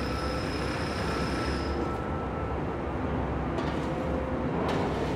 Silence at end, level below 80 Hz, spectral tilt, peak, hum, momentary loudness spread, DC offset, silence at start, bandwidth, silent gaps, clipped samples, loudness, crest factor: 0 s; -40 dBFS; -6.5 dB/octave; -16 dBFS; none; 3 LU; under 0.1%; 0 s; 15.5 kHz; none; under 0.1%; -31 LUFS; 14 dB